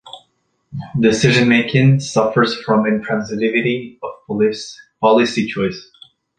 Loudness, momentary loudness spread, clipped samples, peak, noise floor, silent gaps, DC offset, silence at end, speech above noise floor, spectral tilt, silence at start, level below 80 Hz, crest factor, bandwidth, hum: -16 LUFS; 17 LU; under 0.1%; -2 dBFS; -64 dBFS; none; under 0.1%; 0.55 s; 48 dB; -6 dB/octave; 0.05 s; -52 dBFS; 16 dB; 9.4 kHz; none